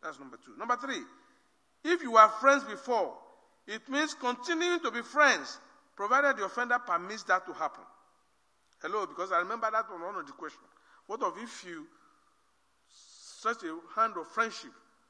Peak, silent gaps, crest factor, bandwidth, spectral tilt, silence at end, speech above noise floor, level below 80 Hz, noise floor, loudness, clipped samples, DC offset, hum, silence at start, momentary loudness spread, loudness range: -6 dBFS; none; 26 dB; 10.5 kHz; -2 dB/octave; 0.4 s; 42 dB; -88 dBFS; -73 dBFS; -30 LUFS; under 0.1%; under 0.1%; none; 0 s; 19 LU; 11 LU